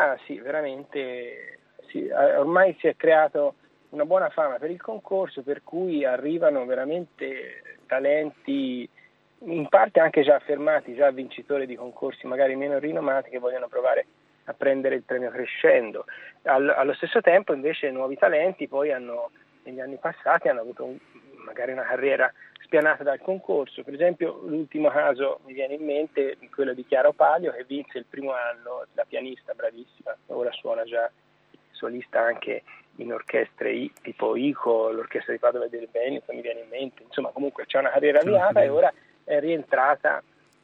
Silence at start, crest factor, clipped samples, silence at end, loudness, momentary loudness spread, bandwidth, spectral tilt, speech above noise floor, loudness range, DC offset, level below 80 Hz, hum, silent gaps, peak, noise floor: 0 s; 22 dB; under 0.1%; 0.45 s; -25 LUFS; 15 LU; 4.3 kHz; -7.5 dB/octave; 30 dB; 6 LU; under 0.1%; -84 dBFS; none; none; -4 dBFS; -55 dBFS